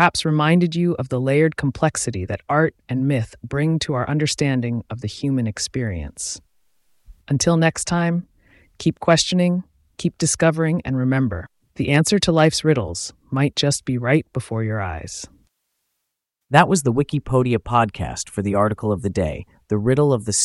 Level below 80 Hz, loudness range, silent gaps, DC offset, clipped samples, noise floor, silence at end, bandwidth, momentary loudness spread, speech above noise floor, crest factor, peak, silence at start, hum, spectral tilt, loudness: -44 dBFS; 4 LU; none; under 0.1%; under 0.1%; -79 dBFS; 0 s; 12 kHz; 11 LU; 60 dB; 20 dB; 0 dBFS; 0 s; none; -5 dB/octave; -20 LUFS